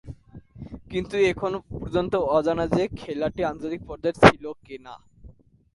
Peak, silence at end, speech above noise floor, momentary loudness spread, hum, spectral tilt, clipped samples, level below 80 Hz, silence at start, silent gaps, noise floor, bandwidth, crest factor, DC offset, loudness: 0 dBFS; 0.45 s; 26 dB; 24 LU; none; -6 dB/octave; under 0.1%; -46 dBFS; 0.05 s; none; -50 dBFS; 11.5 kHz; 24 dB; under 0.1%; -23 LUFS